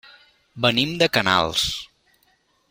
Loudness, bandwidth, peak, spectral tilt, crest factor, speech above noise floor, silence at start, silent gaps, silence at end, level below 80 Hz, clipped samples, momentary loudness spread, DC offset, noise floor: -20 LUFS; 16.5 kHz; 0 dBFS; -3.5 dB/octave; 24 dB; 43 dB; 0.55 s; none; 0.85 s; -50 dBFS; under 0.1%; 6 LU; under 0.1%; -64 dBFS